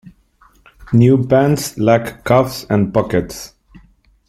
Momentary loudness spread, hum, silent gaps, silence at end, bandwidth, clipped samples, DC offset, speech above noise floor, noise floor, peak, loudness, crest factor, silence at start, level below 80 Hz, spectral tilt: 10 LU; none; none; 0.8 s; 15.5 kHz; under 0.1%; under 0.1%; 38 dB; -52 dBFS; 0 dBFS; -15 LUFS; 16 dB; 0.05 s; -44 dBFS; -7 dB/octave